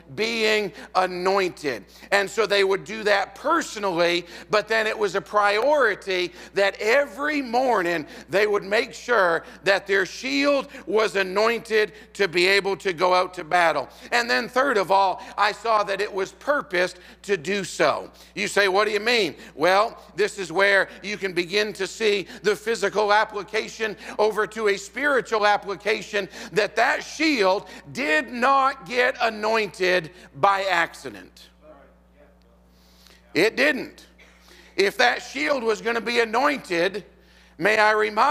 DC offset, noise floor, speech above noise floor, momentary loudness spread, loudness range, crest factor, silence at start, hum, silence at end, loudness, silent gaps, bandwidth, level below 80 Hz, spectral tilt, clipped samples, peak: under 0.1%; -55 dBFS; 32 dB; 8 LU; 3 LU; 22 dB; 0.1 s; none; 0 s; -22 LUFS; none; 16 kHz; -58 dBFS; -3 dB/octave; under 0.1%; -2 dBFS